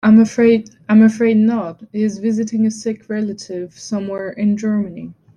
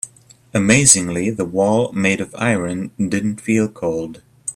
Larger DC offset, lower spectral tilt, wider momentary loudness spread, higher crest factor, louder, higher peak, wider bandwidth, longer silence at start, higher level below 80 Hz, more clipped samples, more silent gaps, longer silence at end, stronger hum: neither; first, -7 dB/octave vs -4 dB/octave; about the same, 15 LU vs 14 LU; about the same, 14 dB vs 18 dB; about the same, -17 LUFS vs -17 LUFS; about the same, -2 dBFS vs 0 dBFS; second, 9.6 kHz vs 16 kHz; about the same, 0.05 s vs 0.05 s; second, -58 dBFS vs -50 dBFS; neither; neither; first, 0.25 s vs 0.05 s; neither